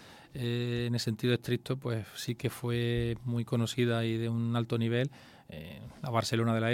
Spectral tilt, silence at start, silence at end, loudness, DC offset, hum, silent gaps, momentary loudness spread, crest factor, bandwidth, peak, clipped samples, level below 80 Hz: -6 dB/octave; 0 s; 0 s; -32 LUFS; under 0.1%; none; none; 12 LU; 18 dB; 16 kHz; -14 dBFS; under 0.1%; -58 dBFS